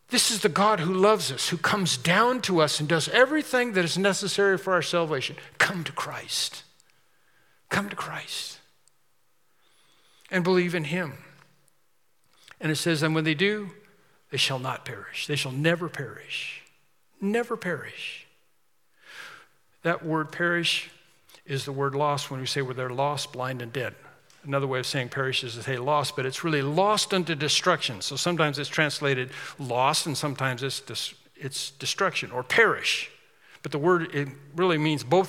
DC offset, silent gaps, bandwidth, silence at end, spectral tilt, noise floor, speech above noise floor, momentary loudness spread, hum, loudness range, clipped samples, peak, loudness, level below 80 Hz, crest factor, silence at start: under 0.1%; none; 17 kHz; 0 s; -4 dB/octave; -72 dBFS; 46 dB; 12 LU; none; 9 LU; under 0.1%; -6 dBFS; -26 LUFS; -76 dBFS; 22 dB; 0.1 s